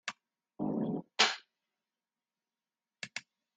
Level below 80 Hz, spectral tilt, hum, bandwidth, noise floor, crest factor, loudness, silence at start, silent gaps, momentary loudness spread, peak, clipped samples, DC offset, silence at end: -78 dBFS; -2.5 dB/octave; none; 9.6 kHz; under -90 dBFS; 28 dB; -34 LUFS; 0.05 s; none; 16 LU; -12 dBFS; under 0.1%; under 0.1%; 0.35 s